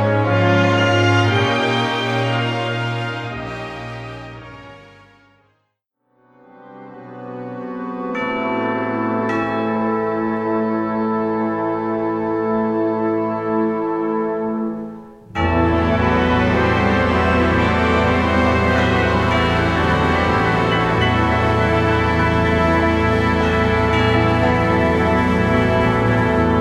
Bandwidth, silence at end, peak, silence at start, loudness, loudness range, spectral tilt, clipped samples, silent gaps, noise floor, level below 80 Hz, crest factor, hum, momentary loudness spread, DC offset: 11 kHz; 0 s; -4 dBFS; 0 s; -17 LUFS; 12 LU; -7 dB/octave; under 0.1%; none; -70 dBFS; -34 dBFS; 14 dB; none; 12 LU; under 0.1%